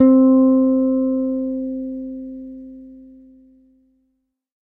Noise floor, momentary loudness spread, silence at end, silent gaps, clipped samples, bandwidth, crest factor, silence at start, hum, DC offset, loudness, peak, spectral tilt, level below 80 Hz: -71 dBFS; 24 LU; 1.7 s; none; under 0.1%; 2.2 kHz; 16 dB; 0 s; none; under 0.1%; -17 LUFS; -2 dBFS; -11.5 dB/octave; -54 dBFS